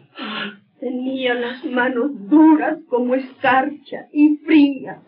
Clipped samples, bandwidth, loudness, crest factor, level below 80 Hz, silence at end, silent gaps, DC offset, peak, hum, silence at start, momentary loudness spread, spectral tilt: under 0.1%; 4.6 kHz; -18 LUFS; 14 dB; -82 dBFS; 0.1 s; none; under 0.1%; -4 dBFS; none; 0.15 s; 14 LU; -2.5 dB/octave